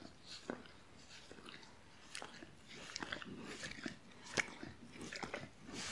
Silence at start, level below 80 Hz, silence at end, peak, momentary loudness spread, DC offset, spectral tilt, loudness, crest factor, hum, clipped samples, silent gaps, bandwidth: 0 s; -72 dBFS; 0 s; -18 dBFS; 16 LU; under 0.1%; -2.5 dB/octave; -48 LUFS; 30 dB; none; under 0.1%; none; 11.5 kHz